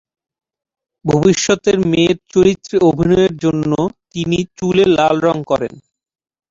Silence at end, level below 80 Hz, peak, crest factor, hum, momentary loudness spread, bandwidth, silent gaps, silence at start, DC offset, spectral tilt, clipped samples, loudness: 0.7 s; -44 dBFS; -2 dBFS; 14 dB; none; 7 LU; 7.8 kHz; none; 1.05 s; under 0.1%; -5.5 dB/octave; under 0.1%; -15 LUFS